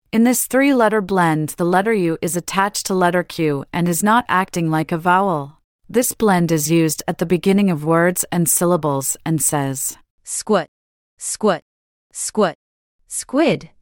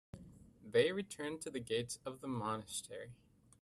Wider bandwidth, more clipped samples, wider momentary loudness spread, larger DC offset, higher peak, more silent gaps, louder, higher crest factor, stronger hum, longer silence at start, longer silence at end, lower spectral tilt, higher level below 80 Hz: first, 18 kHz vs 13 kHz; neither; second, 10 LU vs 23 LU; neither; first, -4 dBFS vs -20 dBFS; first, 5.64-5.79 s, 10.10-10.18 s, 10.68-11.17 s, 11.62-12.10 s, 12.55-12.99 s vs none; first, -18 LUFS vs -40 LUFS; second, 14 dB vs 22 dB; neither; about the same, 0.15 s vs 0.15 s; second, 0.15 s vs 0.5 s; about the same, -4.5 dB/octave vs -4 dB/octave; first, -54 dBFS vs -72 dBFS